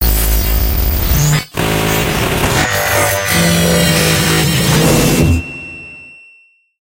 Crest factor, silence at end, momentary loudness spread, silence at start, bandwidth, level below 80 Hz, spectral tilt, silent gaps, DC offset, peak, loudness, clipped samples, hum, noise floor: 14 dB; 0.8 s; 8 LU; 0 s; 16 kHz; -20 dBFS; -4 dB/octave; none; under 0.1%; 0 dBFS; -12 LUFS; under 0.1%; none; -48 dBFS